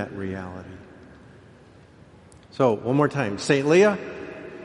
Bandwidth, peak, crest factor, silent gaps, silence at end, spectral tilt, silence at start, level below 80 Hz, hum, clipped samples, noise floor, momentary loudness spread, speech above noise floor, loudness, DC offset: 11.5 kHz; -6 dBFS; 18 dB; none; 0 s; -6 dB/octave; 0 s; -60 dBFS; none; under 0.1%; -50 dBFS; 23 LU; 28 dB; -22 LUFS; under 0.1%